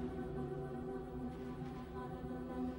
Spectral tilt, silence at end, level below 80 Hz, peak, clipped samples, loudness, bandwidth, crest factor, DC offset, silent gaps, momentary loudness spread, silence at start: -8.5 dB/octave; 0 s; -56 dBFS; -32 dBFS; under 0.1%; -45 LUFS; 16 kHz; 12 dB; under 0.1%; none; 3 LU; 0 s